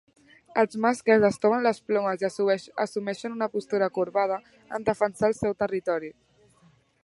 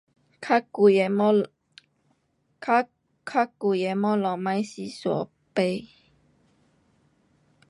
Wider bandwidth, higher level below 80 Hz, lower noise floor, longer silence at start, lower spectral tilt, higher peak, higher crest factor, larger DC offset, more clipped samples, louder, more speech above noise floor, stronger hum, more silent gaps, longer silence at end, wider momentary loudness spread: about the same, 11.5 kHz vs 11 kHz; first, -62 dBFS vs -74 dBFS; second, -61 dBFS vs -71 dBFS; first, 0.55 s vs 0.4 s; about the same, -5.5 dB/octave vs -6.5 dB/octave; about the same, -8 dBFS vs -8 dBFS; about the same, 18 dB vs 20 dB; neither; neither; about the same, -26 LUFS vs -25 LUFS; second, 36 dB vs 47 dB; neither; neither; second, 0.9 s vs 1.85 s; second, 10 LU vs 15 LU